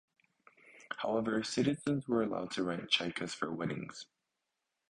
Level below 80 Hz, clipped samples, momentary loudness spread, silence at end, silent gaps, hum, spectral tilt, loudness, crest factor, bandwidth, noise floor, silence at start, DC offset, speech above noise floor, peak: -70 dBFS; under 0.1%; 13 LU; 0.9 s; none; none; -4.5 dB/octave; -35 LUFS; 22 dB; 11 kHz; -86 dBFS; 0.65 s; under 0.1%; 52 dB; -14 dBFS